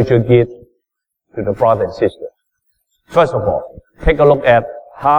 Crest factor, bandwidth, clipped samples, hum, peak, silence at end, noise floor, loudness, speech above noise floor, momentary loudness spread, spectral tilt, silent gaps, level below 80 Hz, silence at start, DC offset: 14 dB; 9.4 kHz; under 0.1%; none; 0 dBFS; 0 s; -77 dBFS; -14 LUFS; 64 dB; 19 LU; -8.5 dB/octave; none; -32 dBFS; 0 s; under 0.1%